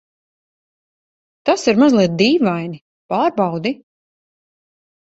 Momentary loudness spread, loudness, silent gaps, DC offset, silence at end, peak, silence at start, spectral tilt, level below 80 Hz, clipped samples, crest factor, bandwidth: 14 LU; -16 LUFS; 2.81-3.09 s; under 0.1%; 1.3 s; -2 dBFS; 1.45 s; -5.5 dB/octave; -60 dBFS; under 0.1%; 18 dB; 8.2 kHz